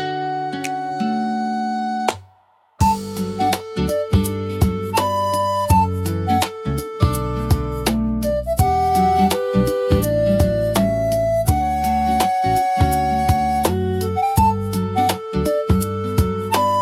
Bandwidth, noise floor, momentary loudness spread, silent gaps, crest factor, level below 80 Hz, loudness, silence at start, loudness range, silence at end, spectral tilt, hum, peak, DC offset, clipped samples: 16.5 kHz; -56 dBFS; 6 LU; none; 16 dB; -32 dBFS; -19 LUFS; 0 s; 4 LU; 0 s; -6 dB/octave; none; -2 dBFS; under 0.1%; under 0.1%